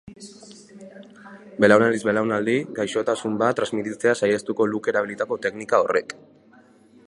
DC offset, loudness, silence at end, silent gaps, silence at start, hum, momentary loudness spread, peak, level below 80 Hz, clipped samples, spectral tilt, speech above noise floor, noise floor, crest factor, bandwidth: under 0.1%; -22 LUFS; 0.95 s; none; 0.05 s; none; 21 LU; -2 dBFS; -64 dBFS; under 0.1%; -5 dB/octave; 31 dB; -53 dBFS; 22 dB; 11.5 kHz